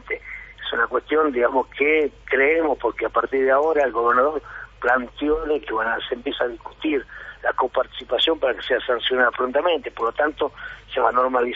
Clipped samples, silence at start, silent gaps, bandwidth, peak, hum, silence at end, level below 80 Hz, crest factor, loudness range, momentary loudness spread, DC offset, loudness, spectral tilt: under 0.1%; 0.05 s; none; 7.4 kHz; -4 dBFS; 50 Hz at -65 dBFS; 0 s; -48 dBFS; 18 dB; 4 LU; 9 LU; under 0.1%; -21 LUFS; 0 dB/octave